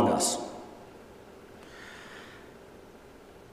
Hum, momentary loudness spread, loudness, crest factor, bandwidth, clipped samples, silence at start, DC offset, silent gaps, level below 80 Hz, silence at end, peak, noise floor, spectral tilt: none; 23 LU; -32 LUFS; 22 dB; 15.5 kHz; under 0.1%; 0 s; under 0.1%; none; -64 dBFS; 0.05 s; -14 dBFS; -51 dBFS; -3.5 dB/octave